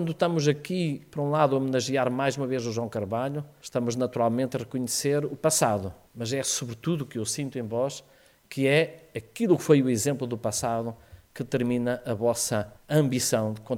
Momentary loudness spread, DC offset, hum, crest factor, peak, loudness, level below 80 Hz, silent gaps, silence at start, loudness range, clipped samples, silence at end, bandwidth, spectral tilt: 8 LU; under 0.1%; none; 20 dB; -8 dBFS; -27 LUFS; -62 dBFS; none; 0 s; 2 LU; under 0.1%; 0 s; 17 kHz; -5 dB/octave